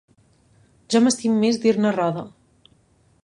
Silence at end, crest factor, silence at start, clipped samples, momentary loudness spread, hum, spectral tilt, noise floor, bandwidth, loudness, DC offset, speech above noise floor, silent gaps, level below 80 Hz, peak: 0.95 s; 18 dB; 0.9 s; under 0.1%; 10 LU; none; -5 dB/octave; -60 dBFS; 11.5 kHz; -20 LUFS; under 0.1%; 41 dB; none; -64 dBFS; -4 dBFS